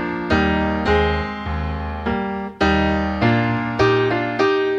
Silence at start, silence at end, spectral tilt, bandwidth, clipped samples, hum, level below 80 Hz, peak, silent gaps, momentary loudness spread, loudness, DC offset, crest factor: 0 s; 0 s; -7 dB/octave; 8 kHz; under 0.1%; none; -32 dBFS; -4 dBFS; none; 8 LU; -19 LUFS; under 0.1%; 16 dB